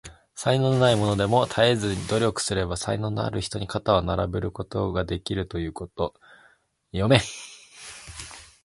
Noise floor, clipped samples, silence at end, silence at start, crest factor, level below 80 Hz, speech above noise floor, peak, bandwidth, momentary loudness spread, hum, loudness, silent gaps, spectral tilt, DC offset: -61 dBFS; under 0.1%; 0.2 s; 0.05 s; 24 dB; -44 dBFS; 37 dB; 0 dBFS; 11.5 kHz; 18 LU; none; -25 LUFS; none; -5 dB/octave; under 0.1%